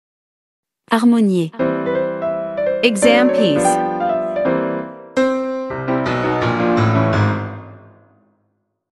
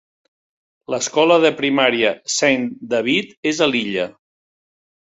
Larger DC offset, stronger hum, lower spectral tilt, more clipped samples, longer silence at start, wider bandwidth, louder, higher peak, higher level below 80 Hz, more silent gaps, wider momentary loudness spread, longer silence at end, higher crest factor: neither; neither; first, -6 dB/octave vs -3 dB/octave; neither; about the same, 0.9 s vs 0.9 s; first, 12 kHz vs 8.2 kHz; about the same, -17 LUFS vs -18 LUFS; about the same, 0 dBFS vs -2 dBFS; first, -52 dBFS vs -64 dBFS; second, none vs 3.37-3.43 s; about the same, 10 LU vs 9 LU; about the same, 1.15 s vs 1.05 s; about the same, 18 dB vs 18 dB